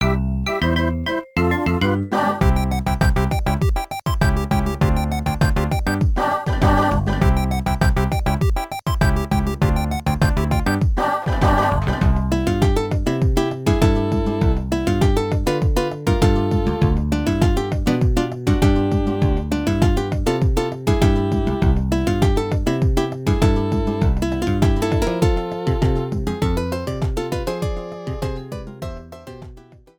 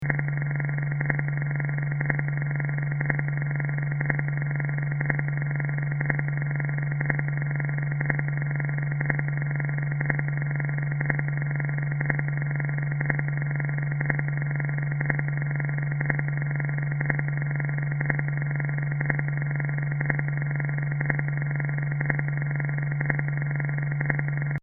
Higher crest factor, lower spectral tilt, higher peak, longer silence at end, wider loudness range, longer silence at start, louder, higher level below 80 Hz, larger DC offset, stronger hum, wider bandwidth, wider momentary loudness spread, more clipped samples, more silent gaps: second, 16 dB vs 22 dB; first, -7 dB/octave vs -5.5 dB/octave; about the same, -2 dBFS vs -4 dBFS; first, 0.4 s vs 0.05 s; about the same, 2 LU vs 0 LU; about the same, 0 s vs 0 s; first, -20 LUFS vs -27 LUFS; first, -24 dBFS vs -50 dBFS; neither; neither; first, 19 kHz vs 2.4 kHz; first, 6 LU vs 1 LU; neither; neither